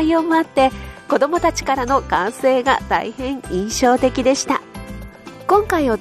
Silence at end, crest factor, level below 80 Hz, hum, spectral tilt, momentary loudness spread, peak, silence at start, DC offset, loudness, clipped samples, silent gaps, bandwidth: 0 s; 14 dB; -38 dBFS; none; -4 dB/octave; 15 LU; -4 dBFS; 0 s; under 0.1%; -18 LUFS; under 0.1%; none; 13.5 kHz